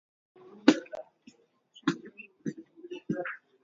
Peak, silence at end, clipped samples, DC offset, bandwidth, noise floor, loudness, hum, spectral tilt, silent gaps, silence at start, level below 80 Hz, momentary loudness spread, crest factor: -4 dBFS; 0.25 s; under 0.1%; under 0.1%; 7.6 kHz; -61 dBFS; -32 LUFS; none; -4 dB/octave; none; 0.5 s; -76 dBFS; 20 LU; 28 dB